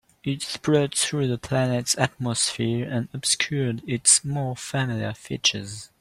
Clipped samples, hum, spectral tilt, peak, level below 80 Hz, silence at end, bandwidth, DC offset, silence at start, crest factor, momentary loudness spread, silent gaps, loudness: under 0.1%; none; -3.5 dB/octave; -4 dBFS; -58 dBFS; 0.15 s; 15 kHz; under 0.1%; 0.25 s; 22 dB; 11 LU; none; -23 LUFS